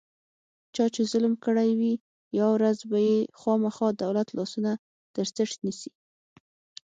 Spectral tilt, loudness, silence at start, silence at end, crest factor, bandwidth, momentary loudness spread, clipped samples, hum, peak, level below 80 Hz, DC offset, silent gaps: -6 dB/octave; -27 LUFS; 0.75 s; 1 s; 16 dB; 8.6 kHz; 10 LU; under 0.1%; none; -12 dBFS; -74 dBFS; under 0.1%; 2.00-2.31 s, 4.79-5.14 s